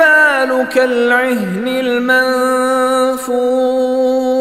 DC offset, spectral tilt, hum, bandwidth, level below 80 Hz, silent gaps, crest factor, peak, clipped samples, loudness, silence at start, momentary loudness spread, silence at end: under 0.1%; -4 dB/octave; none; 15 kHz; -54 dBFS; none; 12 dB; 0 dBFS; under 0.1%; -13 LUFS; 0 s; 5 LU; 0 s